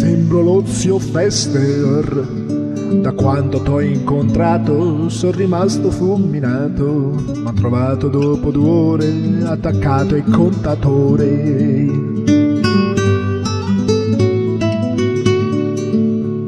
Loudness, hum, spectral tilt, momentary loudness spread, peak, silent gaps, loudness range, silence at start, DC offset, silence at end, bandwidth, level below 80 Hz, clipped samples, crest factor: -15 LUFS; none; -7 dB/octave; 4 LU; 0 dBFS; none; 2 LU; 0 s; under 0.1%; 0 s; 11 kHz; -36 dBFS; under 0.1%; 14 dB